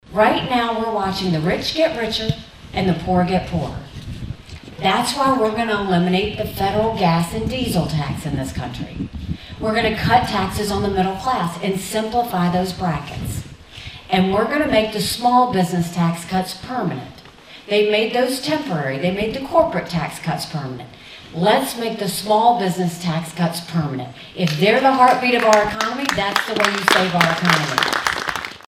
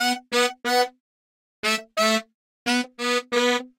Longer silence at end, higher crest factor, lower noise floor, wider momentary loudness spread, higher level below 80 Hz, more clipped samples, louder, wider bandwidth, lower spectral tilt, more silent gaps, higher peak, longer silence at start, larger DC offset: about the same, 0.1 s vs 0.1 s; about the same, 20 dB vs 16 dB; second, -42 dBFS vs under -90 dBFS; first, 14 LU vs 5 LU; first, -42 dBFS vs -74 dBFS; neither; first, -19 LUFS vs -23 LUFS; about the same, 16 kHz vs 16 kHz; first, -5 dB/octave vs -1.5 dB/octave; second, none vs 1.00-1.63 s, 2.34-2.66 s; first, 0 dBFS vs -8 dBFS; about the same, 0.1 s vs 0 s; neither